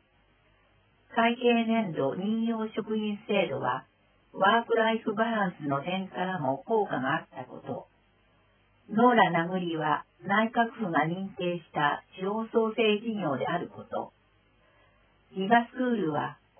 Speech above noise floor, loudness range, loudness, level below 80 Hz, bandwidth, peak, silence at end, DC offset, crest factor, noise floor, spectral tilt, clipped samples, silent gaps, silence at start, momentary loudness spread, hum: 38 dB; 4 LU; -28 LUFS; -72 dBFS; 3.5 kHz; -8 dBFS; 0.25 s; under 0.1%; 22 dB; -66 dBFS; -9.5 dB/octave; under 0.1%; none; 1.1 s; 12 LU; none